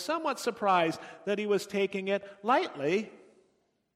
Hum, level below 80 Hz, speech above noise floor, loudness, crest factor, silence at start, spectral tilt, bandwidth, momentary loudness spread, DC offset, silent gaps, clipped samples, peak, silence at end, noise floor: none; -78 dBFS; 43 dB; -30 LUFS; 18 dB; 0 s; -4.5 dB/octave; 15.5 kHz; 6 LU; under 0.1%; none; under 0.1%; -14 dBFS; 0.8 s; -73 dBFS